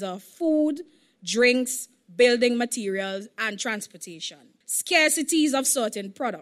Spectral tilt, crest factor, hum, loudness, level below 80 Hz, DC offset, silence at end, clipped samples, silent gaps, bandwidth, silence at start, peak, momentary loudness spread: -2 dB/octave; 18 dB; none; -23 LUFS; -74 dBFS; under 0.1%; 0 s; under 0.1%; none; 15 kHz; 0 s; -8 dBFS; 16 LU